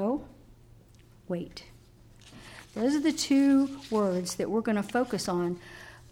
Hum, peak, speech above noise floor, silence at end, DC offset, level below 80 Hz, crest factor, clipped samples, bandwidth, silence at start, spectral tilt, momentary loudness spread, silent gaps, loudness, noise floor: none; -16 dBFS; 28 dB; 0.15 s; under 0.1%; -58 dBFS; 14 dB; under 0.1%; 16 kHz; 0 s; -5 dB/octave; 23 LU; none; -28 LUFS; -56 dBFS